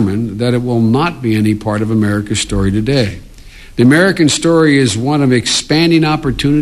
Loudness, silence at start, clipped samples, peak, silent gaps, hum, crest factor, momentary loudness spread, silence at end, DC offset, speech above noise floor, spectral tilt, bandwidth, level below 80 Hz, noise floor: -12 LUFS; 0 s; under 0.1%; 0 dBFS; none; none; 12 dB; 7 LU; 0 s; under 0.1%; 23 dB; -5 dB/octave; 14 kHz; -34 dBFS; -34 dBFS